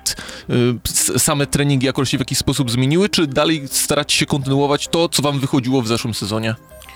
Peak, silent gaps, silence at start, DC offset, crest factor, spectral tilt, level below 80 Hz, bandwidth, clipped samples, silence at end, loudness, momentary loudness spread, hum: -4 dBFS; none; 0.05 s; under 0.1%; 12 dB; -4 dB/octave; -42 dBFS; 20 kHz; under 0.1%; 0 s; -17 LUFS; 6 LU; none